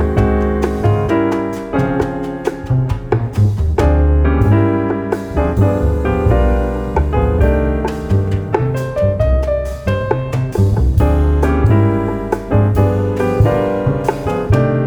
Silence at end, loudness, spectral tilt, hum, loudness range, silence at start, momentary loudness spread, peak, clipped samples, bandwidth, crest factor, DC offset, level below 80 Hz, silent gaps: 0 s; -15 LUFS; -9 dB/octave; none; 2 LU; 0 s; 6 LU; 0 dBFS; under 0.1%; 12 kHz; 14 dB; under 0.1%; -20 dBFS; none